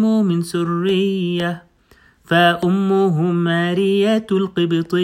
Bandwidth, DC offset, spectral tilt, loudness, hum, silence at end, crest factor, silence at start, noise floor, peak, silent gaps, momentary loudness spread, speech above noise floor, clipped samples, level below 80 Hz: 14.5 kHz; under 0.1%; -7 dB/octave; -18 LUFS; none; 0 s; 14 dB; 0 s; -52 dBFS; -4 dBFS; none; 6 LU; 36 dB; under 0.1%; -58 dBFS